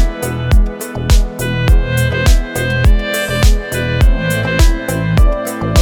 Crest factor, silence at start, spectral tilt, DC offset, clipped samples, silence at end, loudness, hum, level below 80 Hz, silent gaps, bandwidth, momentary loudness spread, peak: 12 dB; 0 s; -5 dB/octave; under 0.1%; under 0.1%; 0 s; -15 LUFS; none; -14 dBFS; none; 18 kHz; 5 LU; 0 dBFS